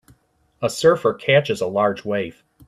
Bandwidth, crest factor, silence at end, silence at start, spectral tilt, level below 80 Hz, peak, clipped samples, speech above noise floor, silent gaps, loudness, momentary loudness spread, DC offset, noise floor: 14 kHz; 18 dB; 0.35 s; 0.6 s; -5 dB/octave; -60 dBFS; -2 dBFS; under 0.1%; 38 dB; none; -20 LUFS; 9 LU; under 0.1%; -57 dBFS